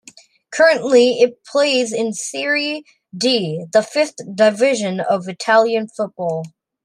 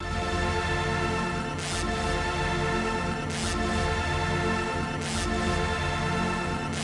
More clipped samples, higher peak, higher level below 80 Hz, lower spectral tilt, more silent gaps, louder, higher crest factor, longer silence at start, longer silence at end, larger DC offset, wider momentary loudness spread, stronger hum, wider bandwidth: neither; first, 0 dBFS vs -14 dBFS; second, -70 dBFS vs -38 dBFS; about the same, -3.5 dB/octave vs -4.5 dB/octave; neither; first, -17 LUFS vs -28 LUFS; about the same, 16 dB vs 14 dB; first, 0.5 s vs 0 s; first, 0.35 s vs 0 s; neither; first, 10 LU vs 3 LU; neither; about the same, 12.5 kHz vs 11.5 kHz